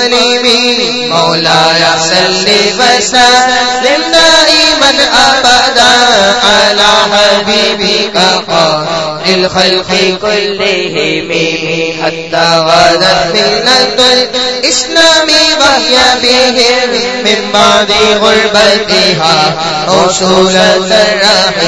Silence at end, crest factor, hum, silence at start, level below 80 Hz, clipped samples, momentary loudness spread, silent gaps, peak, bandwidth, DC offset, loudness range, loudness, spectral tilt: 0 s; 8 dB; none; 0 s; -38 dBFS; 2%; 6 LU; none; 0 dBFS; 11 kHz; 0.9%; 4 LU; -6 LUFS; -2 dB/octave